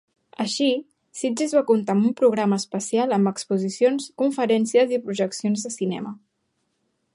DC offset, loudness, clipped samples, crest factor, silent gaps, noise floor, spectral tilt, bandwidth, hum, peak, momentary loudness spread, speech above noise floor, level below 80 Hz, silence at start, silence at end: under 0.1%; -22 LUFS; under 0.1%; 16 dB; none; -73 dBFS; -5 dB/octave; 11.5 kHz; none; -6 dBFS; 8 LU; 51 dB; -74 dBFS; 0.4 s; 1 s